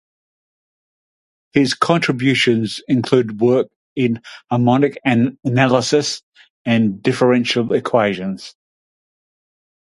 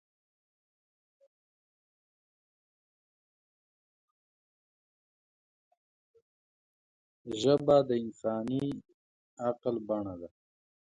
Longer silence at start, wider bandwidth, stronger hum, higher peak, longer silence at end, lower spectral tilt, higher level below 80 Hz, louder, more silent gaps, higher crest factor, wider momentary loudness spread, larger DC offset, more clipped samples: second, 1.55 s vs 7.25 s; first, 11.5 kHz vs 9 kHz; neither; first, 0 dBFS vs -12 dBFS; first, 1.4 s vs 0.55 s; about the same, -5.5 dB/octave vs -6.5 dB/octave; first, -58 dBFS vs -70 dBFS; first, -17 LUFS vs -31 LUFS; about the same, 3.76-3.96 s, 6.23-6.32 s, 6.50-6.65 s vs 8.94-9.37 s; second, 18 dB vs 24 dB; second, 10 LU vs 19 LU; neither; neither